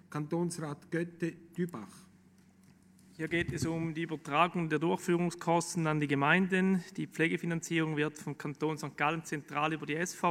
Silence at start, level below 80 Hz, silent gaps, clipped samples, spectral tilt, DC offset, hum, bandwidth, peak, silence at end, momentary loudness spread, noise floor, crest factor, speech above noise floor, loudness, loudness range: 0.1 s; -66 dBFS; none; under 0.1%; -5.5 dB/octave; under 0.1%; none; 15.5 kHz; -10 dBFS; 0 s; 10 LU; -62 dBFS; 22 dB; 29 dB; -33 LUFS; 8 LU